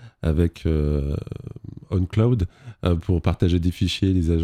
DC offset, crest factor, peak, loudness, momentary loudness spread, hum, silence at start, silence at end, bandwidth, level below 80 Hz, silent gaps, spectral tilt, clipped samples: under 0.1%; 16 dB; -6 dBFS; -23 LUFS; 10 LU; none; 0 s; 0 s; 10 kHz; -34 dBFS; none; -7.5 dB/octave; under 0.1%